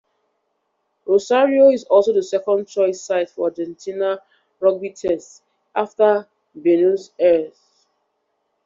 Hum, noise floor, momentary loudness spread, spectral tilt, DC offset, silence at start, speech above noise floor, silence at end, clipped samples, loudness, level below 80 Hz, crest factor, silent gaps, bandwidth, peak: none; -71 dBFS; 11 LU; -5 dB/octave; under 0.1%; 1.05 s; 54 dB; 1.15 s; under 0.1%; -19 LUFS; -66 dBFS; 16 dB; none; 7.6 kHz; -2 dBFS